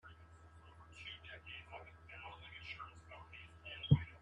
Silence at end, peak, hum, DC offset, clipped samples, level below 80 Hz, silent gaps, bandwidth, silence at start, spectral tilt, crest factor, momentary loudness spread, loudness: 0 s; -16 dBFS; none; under 0.1%; under 0.1%; -60 dBFS; none; 7.8 kHz; 0.05 s; -7.5 dB/octave; 28 dB; 26 LU; -44 LUFS